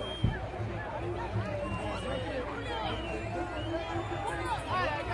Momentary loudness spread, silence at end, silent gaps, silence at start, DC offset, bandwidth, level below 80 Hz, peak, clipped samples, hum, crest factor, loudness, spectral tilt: 5 LU; 0 s; none; 0 s; under 0.1%; 11.5 kHz; -44 dBFS; -14 dBFS; under 0.1%; none; 20 dB; -35 LUFS; -6 dB/octave